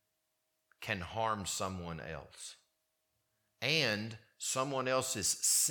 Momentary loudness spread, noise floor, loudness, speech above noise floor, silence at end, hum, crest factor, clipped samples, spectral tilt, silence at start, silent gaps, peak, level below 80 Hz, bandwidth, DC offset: 16 LU; -83 dBFS; -34 LUFS; 47 dB; 0 s; none; 22 dB; under 0.1%; -2 dB/octave; 0.8 s; none; -16 dBFS; -66 dBFS; 19 kHz; under 0.1%